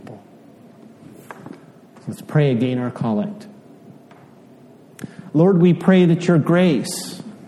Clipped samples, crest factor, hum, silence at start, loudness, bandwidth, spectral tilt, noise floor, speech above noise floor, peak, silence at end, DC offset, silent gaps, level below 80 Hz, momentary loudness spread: under 0.1%; 18 dB; none; 0.05 s; -17 LUFS; 13.5 kHz; -7 dB/octave; -46 dBFS; 29 dB; -2 dBFS; 0 s; under 0.1%; none; -64 dBFS; 24 LU